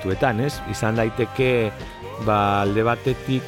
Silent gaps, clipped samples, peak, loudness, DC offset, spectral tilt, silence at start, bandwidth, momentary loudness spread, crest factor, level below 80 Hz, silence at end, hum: none; under 0.1%; -6 dBFS; -22 LUFS; under 0.1%; -6.5 dB/octave; 0 s; 16.5 kHz; 8 LU; 16 dB; -42 dBFS; 0 s; none